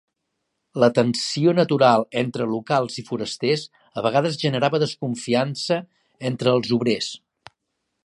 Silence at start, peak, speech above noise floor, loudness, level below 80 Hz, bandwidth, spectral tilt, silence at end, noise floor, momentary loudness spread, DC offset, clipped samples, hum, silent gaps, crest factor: 0.75 s; -2 dBFS; 56 dB; -22 LUFS; -66 dBFS; 11.5 kHz; -5.5 dB/octave; 0.9 s; -77 dBFS; 11 LU; under 0.1%; under 0.1%; none; none; 20 dB